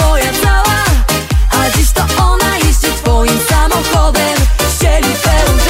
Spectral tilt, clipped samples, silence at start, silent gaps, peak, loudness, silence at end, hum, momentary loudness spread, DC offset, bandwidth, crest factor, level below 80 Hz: -4 dB/octave; under 0.1%; 0 s; none; 0 dBFS; -11 LUFS; 0 s; none; 2 LU; under 0.1%; 16.5 kHz; 10 dB; -12 dBFS